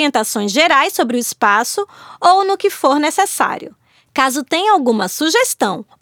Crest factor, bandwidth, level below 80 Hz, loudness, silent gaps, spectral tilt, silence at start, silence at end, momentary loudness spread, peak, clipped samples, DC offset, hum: 16 dB; over 20 kHz; -64 dBFS; -15 LUFS; none; -2 dB/octave; 0 s; 0.2 s; 8 LU; 0 dBFS; under 0.1%; under 0.1%; none